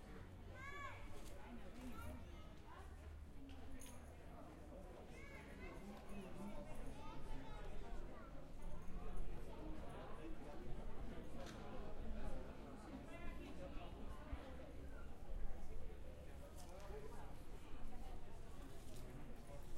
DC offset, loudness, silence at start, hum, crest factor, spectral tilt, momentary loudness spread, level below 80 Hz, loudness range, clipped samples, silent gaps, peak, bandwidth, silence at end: under 0.1%; -56 LUFS; 0 s; none; 18 dB; -6 dB/octave; 5 LU; -54 dBFS; 3 LU; under 0.1%; none; -30 dBFS; 13.5 kHz; 0 s